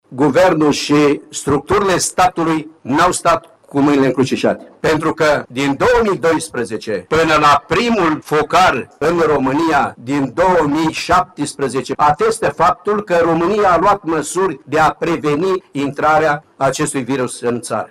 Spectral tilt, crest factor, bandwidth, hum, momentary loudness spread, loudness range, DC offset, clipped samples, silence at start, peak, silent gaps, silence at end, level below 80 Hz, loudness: -4.5 dB/octave; 12 dB; 16 kHz; none; 7 LU; 2 LU; under 0.1%; under 0.1%; 0.1 s; -2 dBFS; none; 0.05 s; -42 dBFS; -15 LUFS